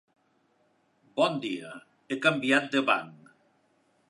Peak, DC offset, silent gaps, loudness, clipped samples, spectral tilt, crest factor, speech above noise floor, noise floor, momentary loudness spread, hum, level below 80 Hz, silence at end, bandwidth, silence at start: -8 dBFS; under 0.1%; none; -27 LUFS; under 0.1%; -4.5 dB/octave; 22 dB; 42 dB; -69 dBFS; 20 LU; none; -84 dBFS; 0.95 s; 11.5 kHz; 1.15 s